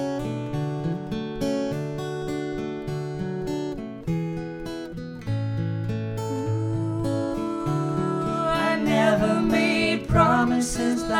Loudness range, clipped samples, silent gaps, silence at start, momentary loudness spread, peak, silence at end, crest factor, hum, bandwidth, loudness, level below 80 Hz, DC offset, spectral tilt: 8 LU; under 0.1%; none; 0 s; 11 LU; -6 dBFS; 0 s; 20 dB; none; 16 kHz; -25 LUFS; -44 dBFS; under 0.1%; -6 dB/octave